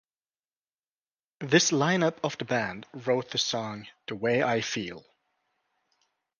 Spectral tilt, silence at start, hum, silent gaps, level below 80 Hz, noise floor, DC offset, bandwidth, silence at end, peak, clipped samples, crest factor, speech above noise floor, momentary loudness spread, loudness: -3.5 dB/octave; 1.4 s; none; none; -70 dBFS; under -90 dBFS; under 0.1%; 10.5 kHz; 1.4 s; -6 dBFS; under 0.1%; 24 dB; over 62 dB; 16 LU; -27 LUFS